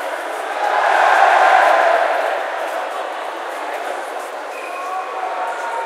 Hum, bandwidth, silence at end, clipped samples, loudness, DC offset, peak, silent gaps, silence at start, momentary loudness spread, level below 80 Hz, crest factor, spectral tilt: none; 15.5 kHz; 0 s; under 0.1%; -17 LUFS; under 0.1%; 0 dBFS; none; 0 s; 14 LU; -90 dBFS; 18 dB; 1 dB/octave